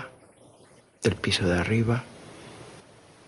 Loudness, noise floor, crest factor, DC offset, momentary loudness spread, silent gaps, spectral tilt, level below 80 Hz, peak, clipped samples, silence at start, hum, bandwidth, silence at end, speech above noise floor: -26 LUFS; -56 dBFS; 22 dB; under 0.1%; 21 LU; none; -5.5 dB/octave; -50 dBFS; -8 dBFS; under 0.1%; 0 s; none; 11.5 kHz; 0.5 s; 31 dB